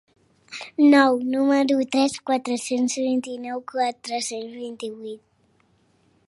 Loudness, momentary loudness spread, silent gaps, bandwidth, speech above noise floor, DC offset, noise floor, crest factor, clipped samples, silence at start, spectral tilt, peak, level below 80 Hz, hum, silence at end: -22 LUFS; 18 LU; none; 11.5 kHz; 41 dB; under 0.1%; -63 dBFS; 20 dB; under 0.1%; 0.5 s; -3 dB/octave; -4 dBFS; -74 dBFS; none; 1.1 s